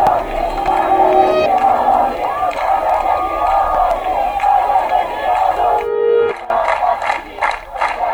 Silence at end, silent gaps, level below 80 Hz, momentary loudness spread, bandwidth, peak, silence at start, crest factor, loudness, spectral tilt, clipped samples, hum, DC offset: 0 s; none; -36 dBFS; 6 LU; over 20 kHz; 0 dBFS; 0 s; 14 dB; -15 LUFS; -5 dB/octave; under 0.1%; none; under 0.1%